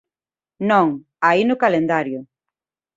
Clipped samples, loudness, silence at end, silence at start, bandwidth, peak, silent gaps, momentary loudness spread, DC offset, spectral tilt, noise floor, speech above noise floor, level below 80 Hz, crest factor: under 0.1%; -18 LUFS; 0.75 s; 0.6 s; 7.8 kHz; -2 dBFS; none; 10 LU; under 0.1%; -7 dB/octave; under -90 dBFS; over 73 dB; -64 dBFS; 18 dB